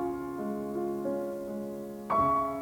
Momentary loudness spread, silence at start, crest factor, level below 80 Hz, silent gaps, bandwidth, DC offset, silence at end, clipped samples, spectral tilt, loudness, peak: 11 LU; 0 s; 16 dB; -58 dBFS; none; over 20 kHz; under 0.1%; 0 s; under 0.1%; -7.5 dB/octave; -32 LUFS; -16 dBFS